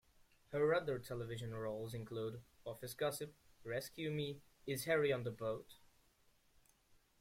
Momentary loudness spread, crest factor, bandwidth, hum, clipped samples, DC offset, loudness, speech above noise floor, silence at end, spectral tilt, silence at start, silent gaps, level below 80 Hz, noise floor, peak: 15 LU; 20 dB; 16.5 kHz; none; under 0.1%; under 0.1%; -42 LUFS; 32 dB; 1.45 s; -5 dB/octave; 0.5 s; none; -72 dBFS; -73 dBFS; -22 dBFS